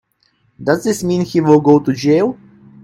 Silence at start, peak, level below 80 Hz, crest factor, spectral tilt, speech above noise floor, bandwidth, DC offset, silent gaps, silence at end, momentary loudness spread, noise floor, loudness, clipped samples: 0.6 s; 0 dBFS; -54 dBFS; 14 dB; -6.5 dB/octave; 47 dB; 15.5 kHz; under 0.1%; none; 0.5 s; 10 LU; -60 dBFS; -14 LUFS; under 0.1%